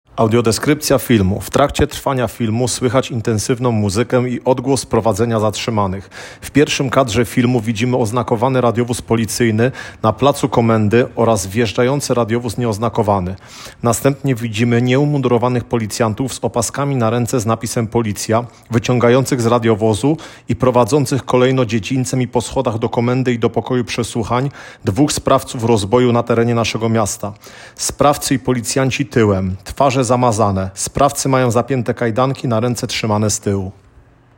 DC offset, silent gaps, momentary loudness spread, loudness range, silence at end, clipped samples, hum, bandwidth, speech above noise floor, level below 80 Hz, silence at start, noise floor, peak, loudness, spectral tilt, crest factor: under 0.1%; none; 6 LU; 2 LU; 0.65 s; under 0.1%; none; 17 kHz; 31 dB; -42 dBFS; 0.15 s; -47 dBFS; 0 dBFS; -16 LUFS; -5.5 dB/octave; 16 dB